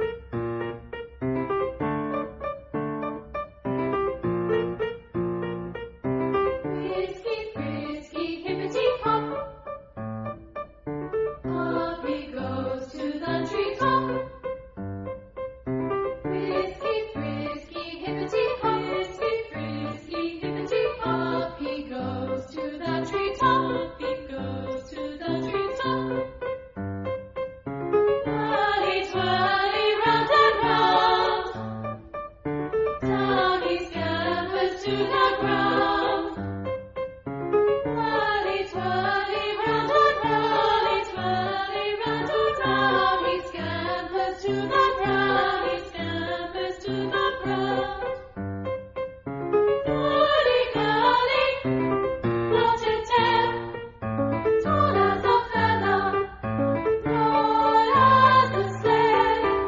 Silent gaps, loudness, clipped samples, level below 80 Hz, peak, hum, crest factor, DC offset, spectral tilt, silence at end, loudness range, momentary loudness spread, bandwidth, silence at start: none; -25 LUFS; under 0.1%; -50 dBFS; -6 dBFS; none; 20 dB; under 0.1%; -6.5 dB/octave; 0 s; 8 LU; 13 LU; 7.6 kHz; 0 s